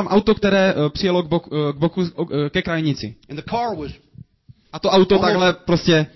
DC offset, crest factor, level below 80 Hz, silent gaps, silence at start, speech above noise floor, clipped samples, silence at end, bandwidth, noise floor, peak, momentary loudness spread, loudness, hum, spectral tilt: under 0.1%; 14 dB; -44 dBFS; none; 0 s; 32 dB; under 0.1%; 0.1 s; 6.2 kHz; -51 dBFS; -4 dBFS; 12 LU; -19 LUFS; none; -6.5 dB/octave